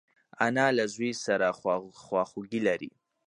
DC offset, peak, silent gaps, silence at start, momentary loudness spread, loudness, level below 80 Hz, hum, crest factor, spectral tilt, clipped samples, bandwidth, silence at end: under 0.1%; -8 dBFS; none; 0.4 s; 8 LU; -29 LUFS; -72 dBFS; none; 22 dB; -4.5 dB/octave; under 0.1%; 11 kHz; 0.4 s